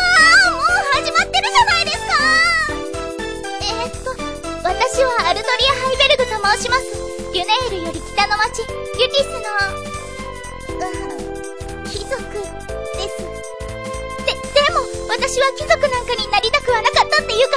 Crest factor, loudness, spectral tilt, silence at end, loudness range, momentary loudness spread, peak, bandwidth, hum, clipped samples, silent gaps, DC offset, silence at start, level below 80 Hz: 16 dB; -17 LUFS; -2 dB/octave; 0 s; 11 LU; 15 LU; -2 dBFS; 11 kHz; none; under 0.1%; none; 1%; 0 s; -36 dBFS